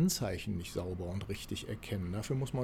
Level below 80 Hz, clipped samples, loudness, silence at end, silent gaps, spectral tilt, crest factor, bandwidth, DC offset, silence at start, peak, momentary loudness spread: -54 dBFS; under 0.1%; -38 LUFS; 0 s; none; -5.5 dB/octave; 16 dB; 16.5 kHz; under 0.1%; 0 s; -20 dBFS; 5 LU